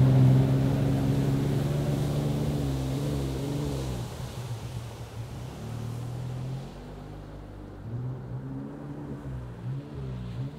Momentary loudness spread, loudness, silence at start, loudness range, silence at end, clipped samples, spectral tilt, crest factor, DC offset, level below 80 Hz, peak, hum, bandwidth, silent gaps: 15 LU; -30 LUFS; 0 s; 11 LU; 0 s; under 0.1%; -7.5 dB/octave; 18 dB; under 0.1%; -44 dBFS; -10 dBFS; none; 15 kHz; none